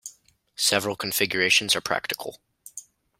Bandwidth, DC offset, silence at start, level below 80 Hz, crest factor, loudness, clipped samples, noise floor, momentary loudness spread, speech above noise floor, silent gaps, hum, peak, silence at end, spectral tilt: 16.5 kHz; under 0.1%; 0.05 s; -66 dBFS; 24 dB; -23 LUFS; under 0.1%; -57 dBFS; 23 LU; 32 dB; none; none; -4 dBFS; 0.4 s; -1.5 dB/octave